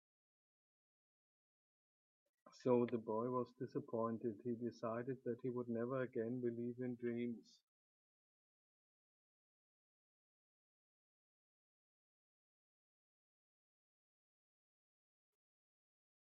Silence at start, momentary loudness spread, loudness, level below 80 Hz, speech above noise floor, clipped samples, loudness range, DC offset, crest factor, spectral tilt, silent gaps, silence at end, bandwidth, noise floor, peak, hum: 2.45 s; 8 LU; -44 LUFS; under -90 dBFS; over 47 dB; under 0.1%; 8 LU; under 0.1%; 24 dB; -8 dB/octave; none; 8.85 s; 6.8 kHz; under -90 dBFS; -24 dBFS; none